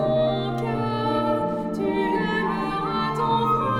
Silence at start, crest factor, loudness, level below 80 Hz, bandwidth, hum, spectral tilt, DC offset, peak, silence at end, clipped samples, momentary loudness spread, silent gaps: 0 s; 12 dB; -24 LUFS; -46 dBFS; 16.5 kHz; none; -7.5 dB/octave; under 0.1%; -12 dBFS; 0 s; under 0.1%; 4 LU; none